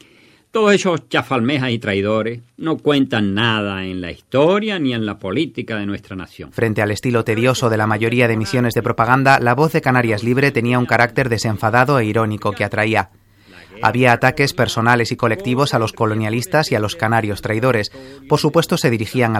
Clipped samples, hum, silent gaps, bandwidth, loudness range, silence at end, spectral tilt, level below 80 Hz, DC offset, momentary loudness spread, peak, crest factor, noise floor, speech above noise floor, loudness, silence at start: under 0.1%; none; none; 16 kHz; 4 LU; 0 s; -5.5 dB/octave; -48 dBFS; under 0.1%; 8 LU; 0 dBFS; 16 dB; -51 dBFS; 34 dB; -17 LUFS; 0.55 s